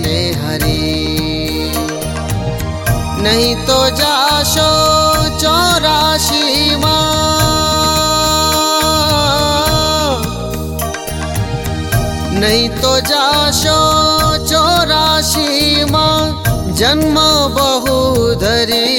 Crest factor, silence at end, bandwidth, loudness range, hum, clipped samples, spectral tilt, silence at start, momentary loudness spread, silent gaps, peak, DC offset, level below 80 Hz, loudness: 12 dB; 0 s; 17 kHz; 5 LU; none; under 0.1%; -3.5 dB/octave; 0 s; 8 LU; none; 0 dBFS; under 0.1%; -26 dBFS; -12 LUFS